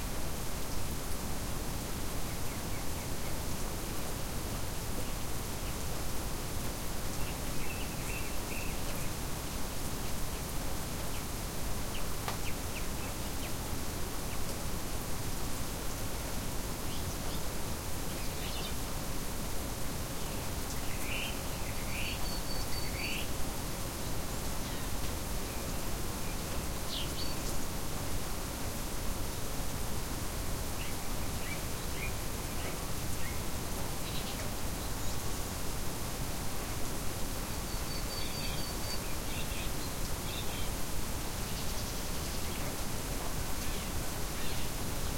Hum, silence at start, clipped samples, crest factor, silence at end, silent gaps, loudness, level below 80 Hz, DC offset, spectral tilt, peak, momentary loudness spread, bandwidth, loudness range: none; 0 s; under 0.1%; 16 dB; 0 s; none; -38 LUFS; -42 dBFS; under 0.1%; -3.5 dB/octave; -18 dBFS; 2 LU; 16.5 kHz; 1 LU